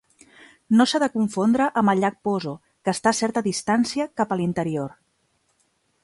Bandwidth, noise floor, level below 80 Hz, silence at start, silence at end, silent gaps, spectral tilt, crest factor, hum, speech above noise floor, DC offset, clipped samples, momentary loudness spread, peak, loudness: 11.5 kHz; -68 dBFS; -62 dBFS; 0.7 s; 1.15 s; none; -5 dB/octave; 18 dB; none; 47 dB; under 0.1%; under 0.1%; 8 LU; -4 dBFS; -22 LUFS